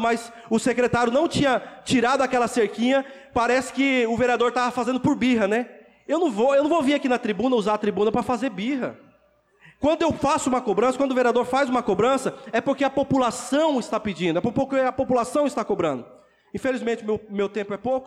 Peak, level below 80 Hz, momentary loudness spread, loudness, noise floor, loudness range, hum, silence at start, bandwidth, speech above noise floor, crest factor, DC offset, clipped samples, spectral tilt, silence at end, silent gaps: -12 dBFS; -54 dBFS; 6 LU; -23 LUFS; -61 dBFS; 3 LU; none; 0 s; 13 kHz; 39 dB; 10 dB; under 0.1%; under 0.1%; -5 dB/octave; 0 s; none